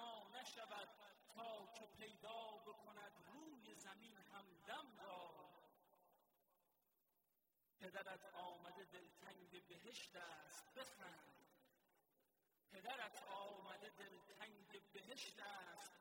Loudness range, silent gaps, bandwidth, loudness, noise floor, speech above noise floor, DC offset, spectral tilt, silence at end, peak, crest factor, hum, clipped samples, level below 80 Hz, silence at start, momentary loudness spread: 5 LU; none; 16 kHz; -58 LUFS; -88 dBFS; 29 dB; under 0.1%; -2 dB/octave; 0 s; -36 dBFS; 22 dB; none; under 0.1%; under -90 dBFS; 0 s; 9 LU